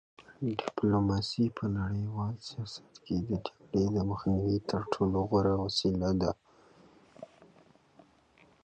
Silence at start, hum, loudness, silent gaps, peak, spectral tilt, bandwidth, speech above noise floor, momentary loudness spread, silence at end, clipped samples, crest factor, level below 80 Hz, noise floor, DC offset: 0.2 s; none; -32 LUFS; none; -12 dBFS; -7 dB/octave; 9 kHz; 33 dB; 14 LU; 1.4 s; under 0.1%; 20 dB; -50 dBFS; -63 dBFS; under 0.1%